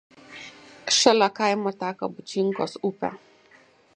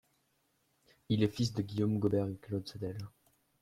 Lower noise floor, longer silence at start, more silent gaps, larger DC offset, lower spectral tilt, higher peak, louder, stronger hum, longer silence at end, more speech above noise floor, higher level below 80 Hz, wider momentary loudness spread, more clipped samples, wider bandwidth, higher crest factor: second, -56 dBFS vs -76 dBFS; second, 0.3 s vs 1.1 s; neither; neither; second, -3 dB/octave vs -7 dB/octave; first, -2 dBFS vs -16 dBFS; first, -24 LUFS vs -35 LUFS; neither; first, 0.8 s vs 0.55 s; second, 33 dB vs 43 dB; second, -72 dBFS vs -66 dBFS; first, 23 LU vs 11 LU; neither; second, 10.5 kHz vs 14 kHz; about the same, 24 dB vs 20 dB